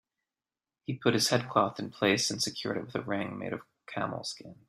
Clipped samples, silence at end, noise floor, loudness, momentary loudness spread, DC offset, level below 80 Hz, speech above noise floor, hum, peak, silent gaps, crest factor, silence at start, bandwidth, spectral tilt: under 0.1%; 0.15 s; under -90 dBFS; -31 LUFS; 13 LU; under 0.1%; -70 dBFS; over 59 dB; none; -10 dBFS; none; 22 dB; 0.9 s; 15.5 kHz; -3.5 dB/octave